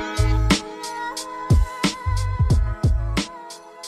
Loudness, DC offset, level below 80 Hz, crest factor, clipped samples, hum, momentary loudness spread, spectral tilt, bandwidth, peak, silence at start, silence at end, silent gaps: -23 LUFS; under 0.1%; -24 dBFS; 14 dB; under 0.1%; none; 11 LU; -5 dB/octave; 14 kHz; -6 dBFS; 0 s; 0 s; none